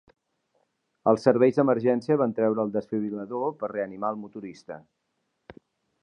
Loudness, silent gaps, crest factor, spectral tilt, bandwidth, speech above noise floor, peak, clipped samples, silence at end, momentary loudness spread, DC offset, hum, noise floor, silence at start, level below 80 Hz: -25 LUFS; none; 22 dB; -8.5 dB/octave; 9.8 kHz; 52 dB; -4 dBFS; under 0.1%; 0.5 s; 19 LU; under 0.1%; none; -77 dBFS; 1.05 s; -72 dBFS